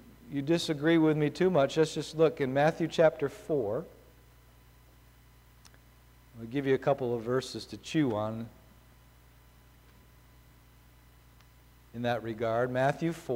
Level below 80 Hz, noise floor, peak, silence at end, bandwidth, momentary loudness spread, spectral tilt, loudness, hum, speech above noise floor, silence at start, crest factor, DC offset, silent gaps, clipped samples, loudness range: -60 dBFS; -58 dBFS; -12 dBFS; 0 s; 16 kHz; 12 LU; -6 dB/octave; -30 LUFS; 50 Hz at -65 dBFS; 29 dB; 0.05 s; 20 dB; under 0.1%; none; under 0.1%; 13 LU